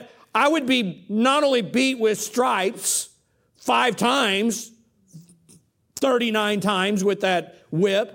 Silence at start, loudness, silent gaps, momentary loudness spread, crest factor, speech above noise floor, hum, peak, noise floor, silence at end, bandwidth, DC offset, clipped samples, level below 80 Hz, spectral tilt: 0 s; -21 LUFS; none; 7 LU; 16 dB; 41 dB; none; -6 dBFS; -62 dBFS; 0 s; 17 kHz; under 0.1%; under 0.1%; -68 dBFS; -3.5 dB/octave